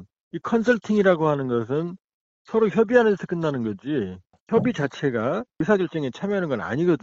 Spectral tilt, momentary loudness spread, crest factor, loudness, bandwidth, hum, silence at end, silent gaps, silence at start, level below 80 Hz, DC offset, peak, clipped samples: -7.5 dB/octave; 9 LU; 18 dB; -23 LUFS; 7.8 kHz; none; 0.05 s; 0.21-0.31 s, 2.04-2.08 s, 2.14-2.45 s, 4.40-4.47 s; 0 s; -60 dBFS; under 0.1%; -4 dBFS; under 0.1%